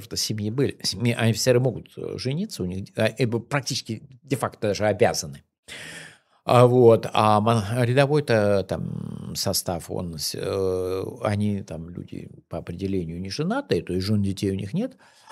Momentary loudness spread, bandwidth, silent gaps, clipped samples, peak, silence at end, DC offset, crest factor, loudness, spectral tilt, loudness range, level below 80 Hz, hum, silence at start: 16 LU; 15 kHz; 5.58-5.63 s; under 0.1%; -2 dBFS; 0.4 s; under 0.1%; 22 dB; -23 LUFS; -5.5 dB/octave; 8 LU; -56 dBFS; none; 0 s